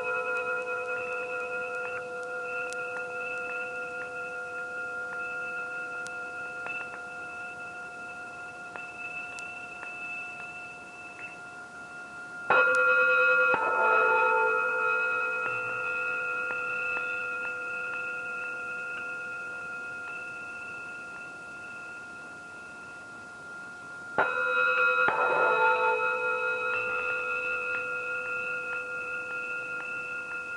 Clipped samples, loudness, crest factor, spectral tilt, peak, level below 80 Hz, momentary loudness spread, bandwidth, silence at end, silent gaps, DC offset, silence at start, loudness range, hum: under 0.1%; -29 LUFS; 22 dB; -3 dB/octave; -8 dBFS; -74 dBFS; 18 LU; 11.5 kHz; 0 s; none; under 0.1%; 0 s; 14 LU; none